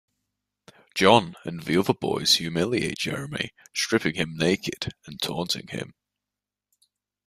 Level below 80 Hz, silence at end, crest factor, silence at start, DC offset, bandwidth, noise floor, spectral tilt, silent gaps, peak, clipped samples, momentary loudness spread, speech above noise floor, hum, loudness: -58 dBFS; 1.35 s; 24 dB; 0.95 s; under 0.1%; 15.5 kHz; -88 dBFS; -4 dB/octave; none; -2 dBFS; under 0.1%; 14 LU; 63 dB; 50 Hz at -60 dBFS; -25 LUFS